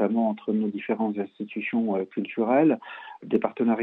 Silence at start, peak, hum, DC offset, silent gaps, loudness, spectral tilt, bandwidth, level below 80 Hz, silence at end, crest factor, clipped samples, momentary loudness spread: 0 s; -8 dBFS; none; under 0.1%; none; -26 LUFS; -10 dB/octave; 4 kHz; -76 dBFS; 0 s; 16 dB; under 0.1%; 11 LU